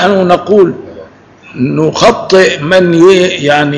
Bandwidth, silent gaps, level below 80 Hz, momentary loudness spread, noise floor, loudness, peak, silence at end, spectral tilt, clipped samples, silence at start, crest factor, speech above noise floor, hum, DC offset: 11 kHz; none; -42 dBFS; 9 LU; -36 dBFS; -8 LUFS; 0 dBFS; 0 s; -5.5 dB/octave; 5%; 0 s; 8 dB; 28 dB; none; under 0.1%